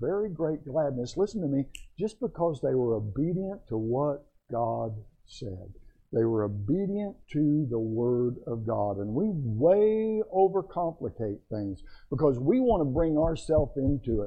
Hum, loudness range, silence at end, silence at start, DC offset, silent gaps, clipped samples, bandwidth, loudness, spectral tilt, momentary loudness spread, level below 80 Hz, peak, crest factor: none; 5 LU; 0 s; 0 s; under 0.1%; none; under 0.1%; 9.2 kHz; -29 LUFS; -9 dB/octave; 11 LU; -46 dBFS; -12 dBFS; 16 dB